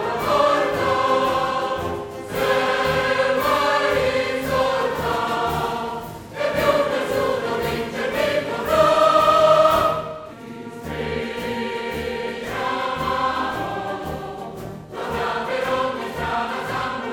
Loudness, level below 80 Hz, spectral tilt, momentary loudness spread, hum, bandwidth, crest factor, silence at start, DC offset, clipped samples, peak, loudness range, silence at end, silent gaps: -21 LUFS; -46 dBFS; -4.5 dB/octave; 14 LU; none; 19 kHz; 18 dB; 0 s; under 0.1%; under 0.1%; -2 dBFS; 7 LU; 0 s; none